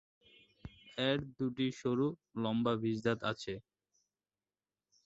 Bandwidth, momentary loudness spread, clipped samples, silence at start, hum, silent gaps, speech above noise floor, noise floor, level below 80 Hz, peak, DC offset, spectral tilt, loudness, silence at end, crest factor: 8 kHz; 14 LU; under 0.1%; 0.65 s; 50 Hz at -75 dBFS; none; over 55 dB; under -90 dBFS; -68 dBFS; -18 dBFS; under 0.1%; -5 dB/octave; -36 LUFS; 1.45 s; 20 dB